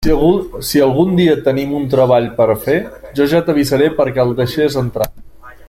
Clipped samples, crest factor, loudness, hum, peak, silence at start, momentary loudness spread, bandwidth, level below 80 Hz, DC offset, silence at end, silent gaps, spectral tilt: under 0.1%; 12 dB; -14 LUFS; none; -2 dBFS; 0 s; 6 LU; 16.5 kHz; -32 dBFS; under 0.1%; 0.05 s; none; -6.5 dB/octave